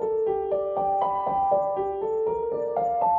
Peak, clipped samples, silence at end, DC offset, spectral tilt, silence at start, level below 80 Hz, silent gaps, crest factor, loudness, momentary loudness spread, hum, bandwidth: -12 dBFS; under 0.1%; 0 s; under 0.1%; -8.5 dB/octave; 0 s; -56 dBFS; none; 14 dB; -26 LUFS; 4 LU; none; 3.6 kHz